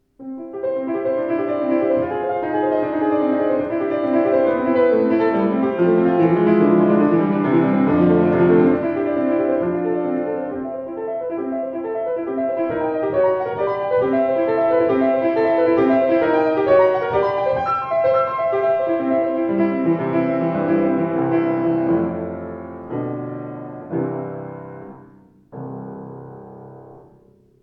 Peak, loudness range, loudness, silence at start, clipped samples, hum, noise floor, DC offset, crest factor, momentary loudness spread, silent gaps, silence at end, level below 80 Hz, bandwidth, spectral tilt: -2 dBFS; 12 LU; -19 LUFS; 0.2 s; under 0.1%; none; -52 dBFS; under 0.1%; 16 dB; 15 LU; none; 0.65 s; -56 dBFS; 5.4 kHz; -10.5 dB/octave